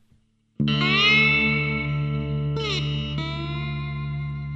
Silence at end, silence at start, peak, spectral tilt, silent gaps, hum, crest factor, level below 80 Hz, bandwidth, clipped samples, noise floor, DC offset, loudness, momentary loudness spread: 0 s; 0.6 s; -6 dBFS; -5.5 dB/octave; none; none; 18 dB; -40 dBFS; 7.6 kHz; under 0.1%; -62 dBFS; under 0.1%; -22 LUFS; 14 LU